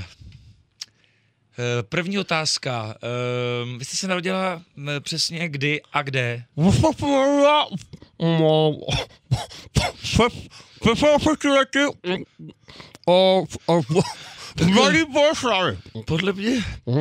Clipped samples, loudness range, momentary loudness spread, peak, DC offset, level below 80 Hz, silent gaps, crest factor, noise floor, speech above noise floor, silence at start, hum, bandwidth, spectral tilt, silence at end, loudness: under 0.1%; 5 LU; 12 LU; -4 dBFS; under 0.1%; -44 dBFS; none; 18 dB; -63 dBFS; 41 dB; 0 s; none; 15.5 kHz; -5 dB/octave; 0 s; -21 LUFS